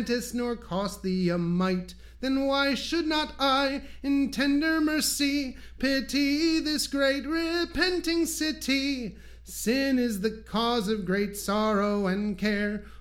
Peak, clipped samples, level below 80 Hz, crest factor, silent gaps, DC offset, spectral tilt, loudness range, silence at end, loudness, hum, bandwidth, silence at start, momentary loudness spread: -10 dBFS; under 0.1%; -48 dBFS; 18 dB; none; under 0.1%; -4 dB/octave; 2 LU; 0.05 s; -27 LUFS; none; 16.5 kHz; 0 s; 7 LU